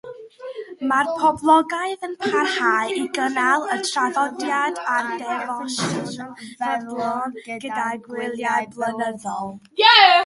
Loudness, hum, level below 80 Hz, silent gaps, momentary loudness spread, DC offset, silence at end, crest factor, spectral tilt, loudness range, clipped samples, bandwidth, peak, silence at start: -21 LUFS; none; -66 dBFS; none; 13 LU; under 0.1%; 0 s; 20 dB; -2.5 dB/octave; 6 LU; under 0.1%; 11.5 kHz; 0 dBFS; 0.05 s